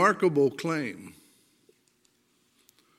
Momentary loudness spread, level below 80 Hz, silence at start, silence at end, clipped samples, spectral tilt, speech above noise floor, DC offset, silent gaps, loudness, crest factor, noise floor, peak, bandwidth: 22 LU; -80 dBFS; 0 s; 1.9 s; under 0.1%; -6 dB/octave; 42 dB; under 0.1%; none; -27 LUFS; 22 dB; -69 dBFS; -8 dBFS; 15 kHz